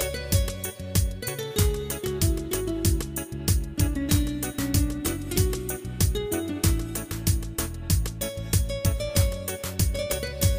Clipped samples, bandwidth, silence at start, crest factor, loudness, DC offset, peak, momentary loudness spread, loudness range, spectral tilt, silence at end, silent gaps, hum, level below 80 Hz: under 0.1%; 16 kHz; 0 s; 16 dB; -27 LUFS; under 0.1%; -10 dBFS; 6 LU; 1 LU; -4.5 dB/octave; 0 s; none; none; -32 dBFS